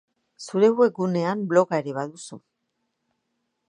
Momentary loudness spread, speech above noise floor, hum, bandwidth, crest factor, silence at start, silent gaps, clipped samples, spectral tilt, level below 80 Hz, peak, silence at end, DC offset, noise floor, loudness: 21 LU; 55 dB; none; 10.5 kHz; 20 dB; 0.4 s; none; under 0.1%; -6.5 dB/octave; -78 dBFS; -4 dBFS; 1.3 s; under 0.1%; -77 dBFS; -22 LUFS